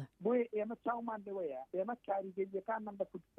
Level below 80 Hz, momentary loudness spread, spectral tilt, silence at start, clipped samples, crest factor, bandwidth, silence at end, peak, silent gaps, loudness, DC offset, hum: -80 dBFS; 7 LU; -9 dB/octave; 0 s; under 0.1%; 16 dB; 4 kHz; 0.15 s; -24 dBFS; none; -39 LUFS; under 0.1%; none